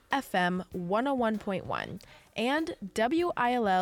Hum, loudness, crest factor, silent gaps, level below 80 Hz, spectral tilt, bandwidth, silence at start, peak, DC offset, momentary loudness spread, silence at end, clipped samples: none; -30 LUFS; 16 dB; none; -60 dBFS; -5.5 dB/octave; 18 kHz; 0.1 s; -14 dBFS; under 0.1%; 8 LU; 0 s; under 0.1%